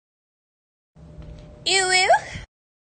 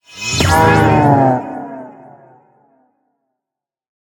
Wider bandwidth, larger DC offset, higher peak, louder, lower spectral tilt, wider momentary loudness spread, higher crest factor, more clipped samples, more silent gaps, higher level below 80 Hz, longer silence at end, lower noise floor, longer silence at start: second, 10 kHz vs 19.5 kHz; neither; second, -6 dBFS vs 0 dBFS; second, -19 LUFS vs -12 LUFS; second, -1 dB/octave vs -5.5 dB/octave; about the same, 20 LU vs 18 LU; about the same, 18 dB vs 16 dB; neither; neither; second, -48 dBFS vs -38 dBFS; second, 0.45 s vs 2.2 s; second, -41 dBFS vs -86 dBFS; first, 1.2 s vs 0.15 s